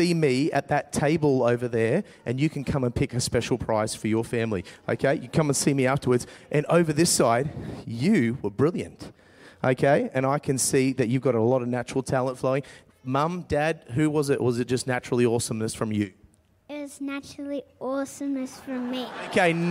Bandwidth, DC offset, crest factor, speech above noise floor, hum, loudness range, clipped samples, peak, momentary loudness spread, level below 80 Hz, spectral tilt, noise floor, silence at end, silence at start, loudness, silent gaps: 16 kHz; under 0.1%; 18 dB; 31 dB; none; 6 LU; under 0.1%; -8 dBFS; 11 LU; -52 dBFS; -5.5 dB/octave; -56 dBFS; 0 s; 0 s; -25 LUFS; none